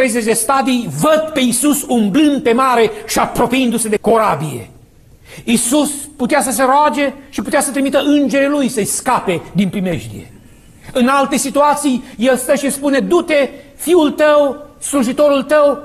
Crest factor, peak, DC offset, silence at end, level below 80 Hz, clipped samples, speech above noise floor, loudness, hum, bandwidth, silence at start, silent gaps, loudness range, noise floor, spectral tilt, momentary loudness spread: 12 dB; -2 dBFS; under 0.1%; 0 s; -44 dBFS; under 0.1%; 30 dB; -14 LUFS; none; 14 kHz; 0 s; none; 3 LU; -44 dBFS; -4 dB/octave; 8 LU